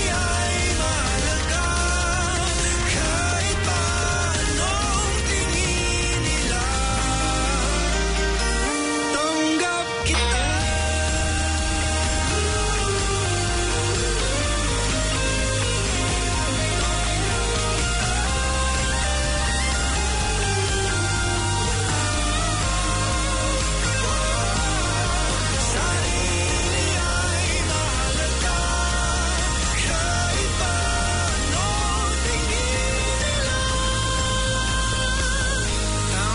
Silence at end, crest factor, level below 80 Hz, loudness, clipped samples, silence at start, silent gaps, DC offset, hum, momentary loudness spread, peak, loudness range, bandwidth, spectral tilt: 0 s; 12 dB; -26 dBFS; -22 LUFS; under 0.1%; 0 s; none; under 0.1%; none; 1 LU; -10 dBFS; 1 LU; 11 kHz; -3 dB/octave